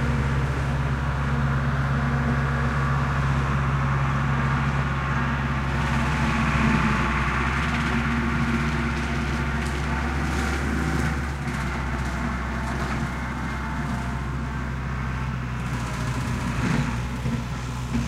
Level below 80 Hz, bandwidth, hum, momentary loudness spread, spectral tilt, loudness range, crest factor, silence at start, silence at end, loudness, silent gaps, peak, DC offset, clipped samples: -30 dBFS; 13 kHz; none; 6 LU; -6.5 dB/octave; 5 LU; 16 dB; 0 s; 0 s; -25 LUFS; none; -8 dBFS; under 0.1%; under 0.1%